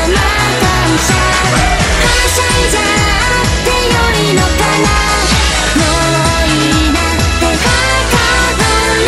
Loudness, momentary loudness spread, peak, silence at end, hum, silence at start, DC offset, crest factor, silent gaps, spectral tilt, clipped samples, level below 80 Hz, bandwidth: -10 LUFS; 1 LU; 0 dBFS; 0 s; none; 0 s; under 0.1%; 10 dB; none; -3.5 dB/octave; under 0.1%; -18 dBFS; 15.5 kHz